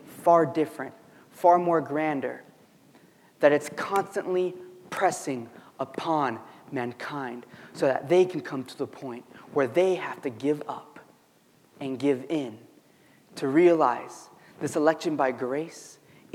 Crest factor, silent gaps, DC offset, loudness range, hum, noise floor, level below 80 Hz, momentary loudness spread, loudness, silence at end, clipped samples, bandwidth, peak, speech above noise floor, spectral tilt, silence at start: 22 dB; none; under 0.1%; 5 LU; none; -61 dBFS; -82 dBFS; 18 LU; -26 LUFS; 0.45 s; under 0.1%; 15.5 kHz; -6 dBFS; 35 dB; -5.5 dB/octave; 0.05 s